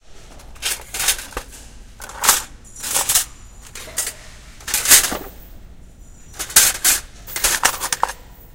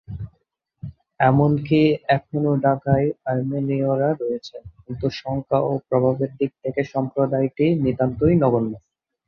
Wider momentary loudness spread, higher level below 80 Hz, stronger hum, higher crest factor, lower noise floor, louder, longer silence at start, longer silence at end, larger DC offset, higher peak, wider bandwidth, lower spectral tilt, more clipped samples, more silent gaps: first, 23 LU vs 18 LU; first, -40 dBFS vs -48 dBFS; neither; about the same, 22 dB vs 18 dB; second, -40 dBFS vs -69 dBFS; first, -16 LUFS vs -21 LUFS; about the same, 0.1 s vs 0.1 s; second, 0 s vs 0.5 s; neither; first, 0 dBFS vs -4 dBFS; first, 17 kHz vs 6.6 kHz; second, 1 dB/octave vs -9 dB/octave; neither; neither